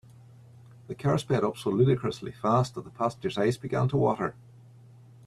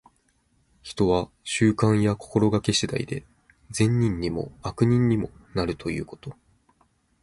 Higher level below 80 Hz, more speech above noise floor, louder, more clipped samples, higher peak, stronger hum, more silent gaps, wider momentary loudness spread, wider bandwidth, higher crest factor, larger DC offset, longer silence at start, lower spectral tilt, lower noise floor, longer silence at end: second, -60 dBFS vs -48 dBFS; second, 25 dB vs 43 dB; second, -28 LUFS vs -24 LUFS; neither; second, -10 dBFS vs -6 dBFS; neither; neither; second, 8 LU vs 14 LU; about the same, 12.5 kHz vs 11.5 kHz; about the same, 18 dB vs 20 dB; neither; about the same, 0.9 s vs 0.85 s; first, -7.5 dB/octave vs -6 dB/octave; second, -52 dBFS vs -67 dBFS; about the same, 0.95 s vs 0.9 s